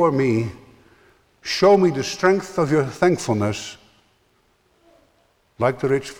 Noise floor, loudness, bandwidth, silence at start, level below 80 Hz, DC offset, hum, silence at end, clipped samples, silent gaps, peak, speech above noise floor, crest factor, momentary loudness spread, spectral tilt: -62 dBFS; -20 LUFS; 15 kHz; 0 s; -56 dBFS; under 0.1%; none; 0.05 s; under 0.1%; none; -4 dBFS; 43 dB; 18 dB; 13 LU; -5.5 dB/octave